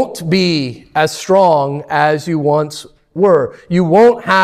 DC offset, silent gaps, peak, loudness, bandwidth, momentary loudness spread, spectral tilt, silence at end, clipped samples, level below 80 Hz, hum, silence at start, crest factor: under 0.1%; none; 0 dBFS; -13 LUFS; 14.5 kHz; 9 LU; -5.5 dB/octave; 0 s; under 0.1%; -52 dBFS; none; 0 s; 12 dB